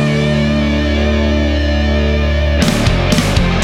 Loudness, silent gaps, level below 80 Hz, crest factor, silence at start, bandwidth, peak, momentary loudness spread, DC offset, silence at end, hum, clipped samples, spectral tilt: -14 LUFS; none; -18 dBFS; 10 dB; 0 s; 14 kHz; -2 dBFS; 2 LU; under 0.1%; 0 s; none; under 0.1%; -6 dB/octave